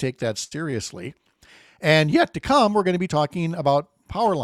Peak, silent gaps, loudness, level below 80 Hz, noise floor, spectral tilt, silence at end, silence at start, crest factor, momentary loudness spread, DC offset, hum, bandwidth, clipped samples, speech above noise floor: -4 dBFS; none; -22 LUFS; -52 dBFS; -53 dBFS; -5.5 dB/octave; 0 s; 0 s; 18 dB; 13 LU; under 0.1%; none; 13.5 kHz; under 0.1%; 32 dB